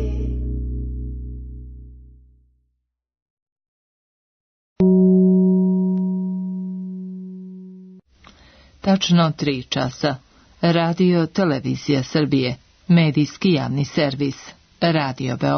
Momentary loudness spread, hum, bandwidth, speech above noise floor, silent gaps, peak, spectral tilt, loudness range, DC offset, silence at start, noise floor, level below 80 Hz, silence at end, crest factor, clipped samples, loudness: 19 LU; none; 6.6 kHz; 55 dB; 3.22-3.46 s, 3.52-3.56 s, 3.68-4.76 s; -6 dBFS; -7 dB/octave; 10 LU; under 0.1%; 0 s; -73 dBFS; -36 dBFS; 0 s; 14 dB; under 0.1%; -20 LUFS